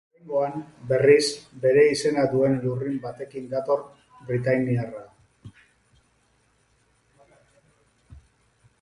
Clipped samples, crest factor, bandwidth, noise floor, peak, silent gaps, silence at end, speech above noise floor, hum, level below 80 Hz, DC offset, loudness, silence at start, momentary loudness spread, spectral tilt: under 0.1%; 22 dB; 11.5 kHz; -65 dBFS; -4 dBFS; none; 0.65 s; 42 dB; none; -60 dBFS; under 0.1%; -23 LUFS; 0.25 s; 17 LU; -5.5 dB/octave